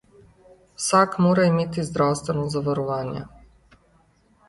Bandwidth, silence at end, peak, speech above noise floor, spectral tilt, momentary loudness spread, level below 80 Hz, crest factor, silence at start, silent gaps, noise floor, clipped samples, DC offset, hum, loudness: 11.5 kHz; 1.2 s; -6 dBFS; 38 dB; -5.5 dB/octave; 11 LU; -54 dBFS; 18 dB; 0.8 s; none; -60 dBFS; under 0.1%; under 0.1%; none; -22 LUFS